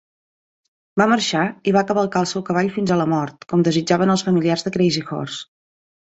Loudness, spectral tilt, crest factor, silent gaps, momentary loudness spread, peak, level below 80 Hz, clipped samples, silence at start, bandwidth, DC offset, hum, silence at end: -19 LUFS; -5.5 dB/octave; 18 dB; none; 7 LU; -2 dBFS; -58 dBFS; under 0.1%; 0.95 s; 8.2 kHz; under 0.1%; none; 0.7 s